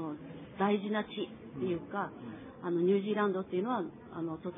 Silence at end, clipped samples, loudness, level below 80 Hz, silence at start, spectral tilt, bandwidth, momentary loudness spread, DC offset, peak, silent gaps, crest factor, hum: 0 s; under 0.1%; -34 LUFS; -70 dBFS; 0 s; -5.5 dB/octave; 3.9 kHz; 13 LU; under 0.1%; -16 dBFS; none; 18 dB; none